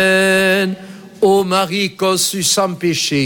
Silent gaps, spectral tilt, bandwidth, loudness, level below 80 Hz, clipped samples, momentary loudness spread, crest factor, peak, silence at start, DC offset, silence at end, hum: none; -3 dB/octave; 17.5 kHz; -14 LUFS; -56 dBFS; under 0.1%; 6 LU; 12 dB; -2 dBFS; 0 s; under 0.1%; 0 s; none